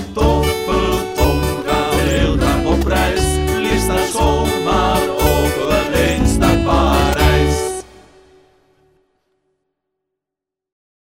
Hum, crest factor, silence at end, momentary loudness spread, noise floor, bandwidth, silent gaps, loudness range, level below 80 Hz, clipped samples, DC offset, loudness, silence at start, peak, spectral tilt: none; 16 dB; 3.3 s; 4 LU; -84 dBFS; 16.5 kHz; none; 5 LU; -22 dBFS; under 0.1%; under 0.1%; -16 LUFS; 0 s; 0 dBFS; -5 dB/octave